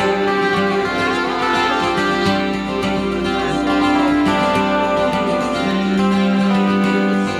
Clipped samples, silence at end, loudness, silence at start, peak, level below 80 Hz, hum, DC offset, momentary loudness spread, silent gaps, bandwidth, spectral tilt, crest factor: under 0.1%; 0 s; -17 LUFS; 0 s; -4 dBFS; -42 dBFS; none; under 0.1%; 4 LU; none; 12.5 kHz; -6 dB/octave; 14 dB